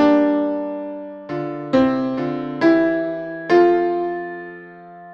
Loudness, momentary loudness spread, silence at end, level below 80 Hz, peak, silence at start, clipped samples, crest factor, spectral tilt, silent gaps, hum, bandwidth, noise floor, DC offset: -19 LUFS; 18 LU; 0 s; -54 dBFS; -2 dBFS; 0 s; under 0.1%; 16 dB; -7.5 dB/octave; none; none; 6.4 kHz; -39 dBFS; under 0.1%